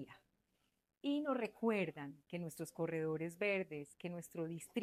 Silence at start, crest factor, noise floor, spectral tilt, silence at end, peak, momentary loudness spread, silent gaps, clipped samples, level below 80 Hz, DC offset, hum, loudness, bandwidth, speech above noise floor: 0 s; 18 dB; -83 dBFS; -6 dB/octave; 0 s; -26 dBFS; 10 LU; none; under 0.1%; -82 dBFS; under 0.1%; none; -42 LUFS; 15 kHz; 42 dB